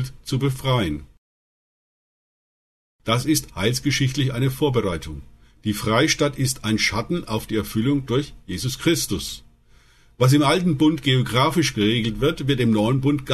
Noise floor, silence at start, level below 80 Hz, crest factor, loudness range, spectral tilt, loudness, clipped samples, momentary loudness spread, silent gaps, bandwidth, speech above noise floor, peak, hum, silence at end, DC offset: -53 dBFS; 0 s; -44 dBFS; 18 dB; 6 LU; -5 dB/octave; -21 LUFS; under 0.1%; 10 LU; 1.18-2.99 s; 13.5 kHz; 32 dB; -4 dBFS; none; 0 s; under 0.1%